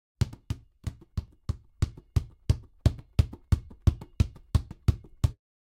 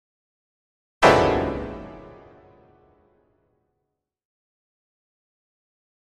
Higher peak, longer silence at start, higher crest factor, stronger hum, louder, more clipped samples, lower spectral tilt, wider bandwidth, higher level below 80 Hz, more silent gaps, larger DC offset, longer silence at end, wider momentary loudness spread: second, -8 dBFS vs 0 dBFS; second, 0.2 s vs 1 s; second, 20 dB vs 26 dB; neither; second, -31 LUFS vs -20 LUFS; neither; first, -7 dB/octave vs -5 dB/octave; about the same, 13.5 kHz vs 13 kHz; first, -34 dBFS vs -46 dBFS; neither; neither; second, 0.4 s vs 4.05 s; second, 12 LU vs 22 LU